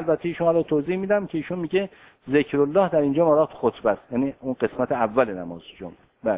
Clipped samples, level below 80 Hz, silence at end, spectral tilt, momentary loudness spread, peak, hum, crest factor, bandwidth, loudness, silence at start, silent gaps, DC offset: under 0.1%; -58 dBFS; 0 s; -11 dB/octave; 14 LU; -4 dBFS; none; 18 dB; 4 kHz; -23 LUFS; 0 s; none; under 0.1%